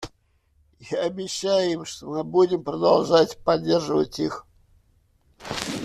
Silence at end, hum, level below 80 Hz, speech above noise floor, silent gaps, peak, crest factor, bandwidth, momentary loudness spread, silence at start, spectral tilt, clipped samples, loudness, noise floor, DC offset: 0 s; none; -56 dBFS; 42 dB; none; -4 dBFS; 20 dB; 13.5 kHz; 12 LU; 0 s; -5 dB/octave; under 0.1%; -23 LUFS; -64 dBFS; under 0.1%